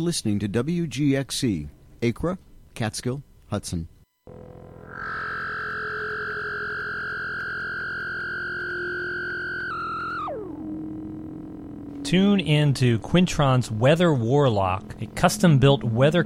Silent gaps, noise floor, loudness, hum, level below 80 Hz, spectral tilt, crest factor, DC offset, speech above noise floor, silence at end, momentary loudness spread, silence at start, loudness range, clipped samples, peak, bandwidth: none; -46 dBFS; -24 LUFS; none; -48 dBFS; -6 dB/octave; 20 dB; under 0.1%; 25 dB; 0 s; 16 LU; 0 s; 10 LU; under 0.1%; -4 dBFS; 15 kHz